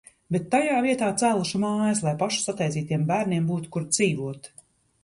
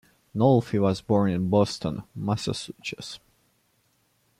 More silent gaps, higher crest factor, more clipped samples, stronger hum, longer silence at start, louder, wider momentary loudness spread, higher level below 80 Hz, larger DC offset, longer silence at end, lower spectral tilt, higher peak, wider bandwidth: neither; about the same, 16 dB vs 18 dB; neither; neither; about the same, 0.3 s vs 0.35 s; about the same, -25 LUFS vs -25 LUFS; second, 7 LU vs 15 LU; about the same, -62 dBFS vs -58 dBFS; neither; second, 0.55 s vs 1.25 s; second, -5 dB/octave vs -7 dB/octave; about the same, -10 dBFS vs -8 dBFS; second, 11.5 kHz vs 13.5 kHz